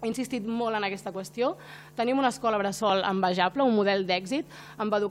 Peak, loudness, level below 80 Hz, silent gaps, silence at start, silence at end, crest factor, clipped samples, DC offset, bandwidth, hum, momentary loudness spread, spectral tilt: -10 dBFS; -27 LUFS; -66 dBFS; none; 0 s; 0 s; 18 dB; under 0.1%; under 0.1%; 16 kHz; none; 10 LU; -5 dB/octave